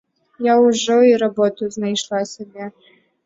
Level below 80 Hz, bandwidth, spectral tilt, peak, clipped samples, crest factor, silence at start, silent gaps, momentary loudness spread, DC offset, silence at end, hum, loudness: -66 dBFS; 7.8 kHz; -4 dB/octave; -4 dBFS; under 0.1%; 14 dB; 0.4 s; none; 18 LU; under 0.1%; 0.55 s; none; -17 LUFS